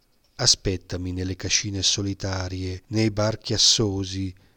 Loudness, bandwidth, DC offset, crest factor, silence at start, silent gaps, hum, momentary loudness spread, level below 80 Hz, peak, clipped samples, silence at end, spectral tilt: -23 LUFS; 18.5 kHz; under 0.1%; 22 dB; 0.4 s; none; none; 13 LU; -46 dBFS; -4 dBFS; under 0.1%; 0.25 s; -3 dB/octave